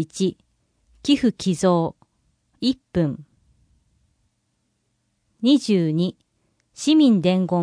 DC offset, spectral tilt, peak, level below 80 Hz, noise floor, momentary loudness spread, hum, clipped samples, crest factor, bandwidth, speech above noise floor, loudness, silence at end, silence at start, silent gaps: under 0.1%; -6 dB/octave; -6 dBFS; -56 dBFS; -71 dBFS; 10 LU; none; under 0.1%; 16 dB; 10.5 kHz; 52 dB; -21 LUFS; 0 s; 0 s; none